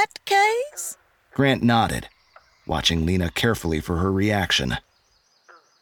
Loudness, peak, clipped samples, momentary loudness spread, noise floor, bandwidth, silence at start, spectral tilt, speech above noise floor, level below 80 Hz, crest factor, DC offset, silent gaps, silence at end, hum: -22 LUFS; -4 dBFS; under 0.1%; 13 LU; -63 dBFS; 19 kHz; 0 s; -4.5 dB/octave; 42 dB; -40 dBFS; 18 dB; under 0.1%; none; 1.05 s; none